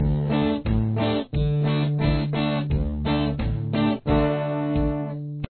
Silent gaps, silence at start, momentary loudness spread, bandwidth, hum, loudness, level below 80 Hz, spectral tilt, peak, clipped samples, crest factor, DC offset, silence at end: none; 0 s; 4 LU; 4.5 kHz; none; -24 LUFS; -32 dBFS; -11 dB/octave; -10 dBFS; under 0.1%; 14 dB; under 0.1%; 0.05 s